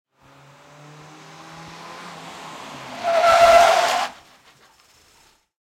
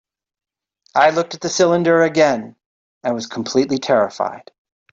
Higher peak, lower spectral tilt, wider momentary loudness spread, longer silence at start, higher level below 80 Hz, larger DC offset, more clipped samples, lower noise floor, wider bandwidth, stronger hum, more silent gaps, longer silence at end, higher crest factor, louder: about the same, -4 dBFS vs -2 dBFS; second, -1.5 dB/octave vs -4.5 dB/octave; first, 26 LU vs 11 LU; first, 1.55 s vs 0.95 s; first, -54 dBFS vs -62 dBFS; neither; neither; second, -57 dBFS vs -62 dBFS; first, 16.5 kHz vs 7.8 kHz; neither; second, none vs 2.66-3.01 s; first, 1.5 s vs 0.55 s; about the same, 18 dB vs 16 dB; about the same, -16 LUFS vs -17 LUFS